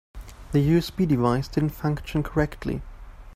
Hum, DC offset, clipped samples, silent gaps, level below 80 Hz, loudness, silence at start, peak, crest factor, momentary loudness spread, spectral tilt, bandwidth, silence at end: none; under 0.1%; under 0.1%; none; -40 dBFS; -25 LUFS; 0.15 s; -8 dBFS; 18 dB; 11 LU; -7.5 dB/octave; 15.5 kHz; 0 s